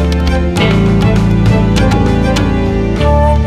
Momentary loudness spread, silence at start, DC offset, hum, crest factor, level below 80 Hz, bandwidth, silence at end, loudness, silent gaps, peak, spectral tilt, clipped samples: 3 LU; 0 s; under 0.1%; none; 10 dB; -16 dBFS; 12.5 kHz; 0 s; -11 LUFS; none; 0 dBFS; -7 dB/octave; under 0.1%